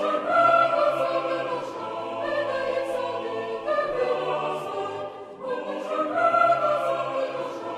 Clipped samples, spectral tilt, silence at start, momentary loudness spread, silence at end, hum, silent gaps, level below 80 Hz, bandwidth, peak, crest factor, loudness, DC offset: under 0.1%; -5 dB/octave; 0 s; 12 LU; 0 s; none; none; -66 dBFS; 12.5 kHz; -8 dBFS; 16 dB; -25 LUFS; under 0.1%